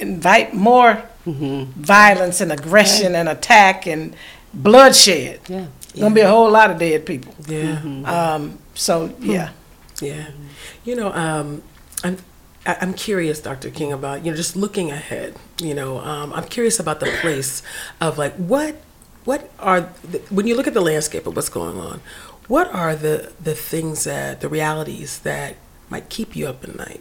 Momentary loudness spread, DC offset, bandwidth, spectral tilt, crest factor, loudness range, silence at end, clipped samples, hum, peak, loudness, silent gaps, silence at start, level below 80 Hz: 19 LU; under 0.1%; 17 kHz; -3.5 dB/octave; 18 dB; 12 LU; 0.05 s; 0.2%; none; 0 dBFS; -16 LUFS; none; 0 s; -48 dBFS